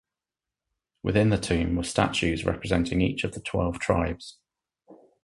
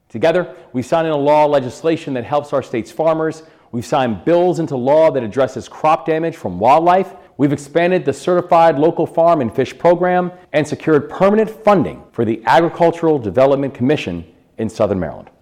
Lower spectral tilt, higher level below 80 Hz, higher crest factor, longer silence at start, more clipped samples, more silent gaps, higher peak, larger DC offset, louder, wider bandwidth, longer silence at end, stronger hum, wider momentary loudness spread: second, -5.5 dB/octave vs -7 dB/octave; first, -42 dBFS vs -54 dBFS; first, 22 dB vs 12 dB; first, 1.05 s vs 0.15 s; neither; neither; about the same, -4 dBFS vs -2 dBFS; neither; second, -26 LUFS vs -16 LUFS; second, 11.5 kHz vs 14 kHz; about the same, 0.3 s vs 0.2 s; neither; about the same, 8 LU vs 10 LU